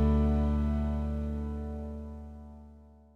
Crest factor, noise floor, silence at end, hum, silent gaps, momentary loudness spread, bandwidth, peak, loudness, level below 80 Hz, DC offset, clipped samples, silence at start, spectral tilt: 14 dB; -54 dBFS; 0.3 s; none; none; 21 LU; 4.2 kHz; -18 dBFS; -32 LUFS; -34 dBFS; under 0.1%; under 0.1%; 0 s; -10 dB/octave